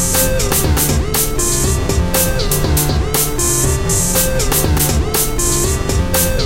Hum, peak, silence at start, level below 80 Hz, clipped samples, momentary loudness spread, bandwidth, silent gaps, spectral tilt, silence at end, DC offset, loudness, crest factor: none; -2 dBFS; 0 s; -20 dBFS; under 0.1%; 2 LU; 17 kHz; none; -3.5 dB/octave; 0 s; under 0.1%; -14 LUFS; 12 dB